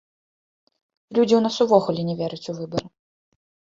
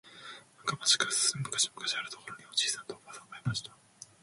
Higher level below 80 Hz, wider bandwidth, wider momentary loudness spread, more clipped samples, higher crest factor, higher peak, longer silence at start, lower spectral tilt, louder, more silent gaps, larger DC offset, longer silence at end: first, -62 dBFS vs -70 dBFS; second, 7.6 kHz vs 12 kHz; second, 12 LU vs 21 LU; neither; about the same, 22 dB vs 24 dB; first, -2 dBFS vs -12 dBFS; first, 1.1 s vs 0.05 s; first, -6.5 dB/octave vs -1 dB/octave; first, -22 LUFS vs -30 LUFS; neither; neither; first, 0.9 s vs 0.2 s